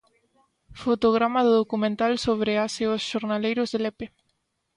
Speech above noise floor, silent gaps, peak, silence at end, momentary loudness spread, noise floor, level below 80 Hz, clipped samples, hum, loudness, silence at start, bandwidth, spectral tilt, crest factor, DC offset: 51 dB; none; -8 dBFS; 0.7 s; 9 LU; -74 dBFS; -58 dBFS; under 0.1%; none; -24 LUFS; 0.7 s; 11 kHz; -5 dB/octave; 16 dB; under 0.1%